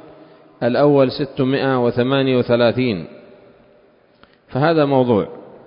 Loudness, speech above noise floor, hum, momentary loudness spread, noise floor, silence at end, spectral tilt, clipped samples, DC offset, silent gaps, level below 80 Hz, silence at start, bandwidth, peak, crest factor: -17 LUFS; 37 dB; none; 10 LU; -53 dBFS; 0.1 s; -12 dB/octave; under 0.1%; under 0.1%; none; -54 dBFS; 0.6 s; 5.4 kHz; -2 dBFS; 16 dB